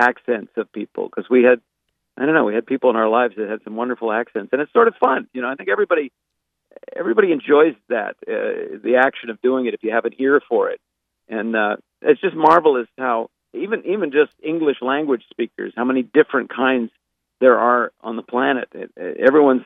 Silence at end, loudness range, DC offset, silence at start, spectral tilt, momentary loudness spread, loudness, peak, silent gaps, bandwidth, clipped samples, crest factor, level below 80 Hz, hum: 0 s; 2 LU; under 0.1%; 0 s; -7 dB/octave; 12 LU; -19 LUFS; 0 dBFS; none; 5 kHz; under 0.1%; 18 dB; -72 dBFS; none